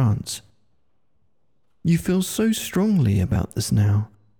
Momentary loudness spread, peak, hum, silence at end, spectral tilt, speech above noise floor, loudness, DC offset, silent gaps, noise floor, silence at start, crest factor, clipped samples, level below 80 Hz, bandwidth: 8 LU; -10 dBFS; none; 0.35 s; -6 dB/octave; 52 dB; -22 LUFS; 0.1%; none; -72 dBFS; 0 s; 12 dB; under 0.1%; -46 dBFS; 19.5 kHz